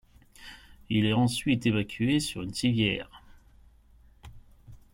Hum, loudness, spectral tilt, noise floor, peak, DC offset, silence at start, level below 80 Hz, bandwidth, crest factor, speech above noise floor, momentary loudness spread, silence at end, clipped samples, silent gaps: none; -27 LUFS; -5.5 dB/octave; -57 dBFS; -12 dBFS; under 0.1%; 0.4 s; -52 dBFS; 16.5 kHz; 18 dB; 31 dB; 22 LU; 0.2 s; under 0.1%; none